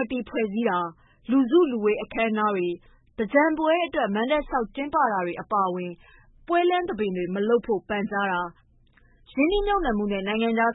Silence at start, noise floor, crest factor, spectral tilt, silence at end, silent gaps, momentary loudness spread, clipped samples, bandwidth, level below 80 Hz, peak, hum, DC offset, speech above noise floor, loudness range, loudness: 0 s; -58 dBFS; 20 dB; -10 dB/octave; 0 s; none; 9 LU; under 0.1%; 4 kHz; -46 dBFS; -6 dBFS; none; under 0.1%; 34 dB; 3 LU; -25 LUFS